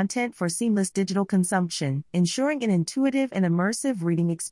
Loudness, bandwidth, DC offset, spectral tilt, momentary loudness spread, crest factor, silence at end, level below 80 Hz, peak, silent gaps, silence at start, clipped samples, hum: -25 LUFS; 12 kHz; under 0.1%; -5.5 dB/octave; 3 LU; 14 dB; 0 s; -70 dBFS; -10 dBFS; none; 0 s; under 0.1%; none